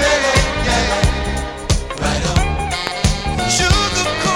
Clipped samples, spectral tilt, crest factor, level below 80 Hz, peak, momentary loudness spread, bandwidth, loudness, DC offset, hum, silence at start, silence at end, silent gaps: under 0.1%; -3.5 dB/octave; 16 dB; -22 dBFS; -2 dBFS; 7 LU; 16.5 kHz; -17 LUFS; under 0.1%; none; 0 s; 0 s; none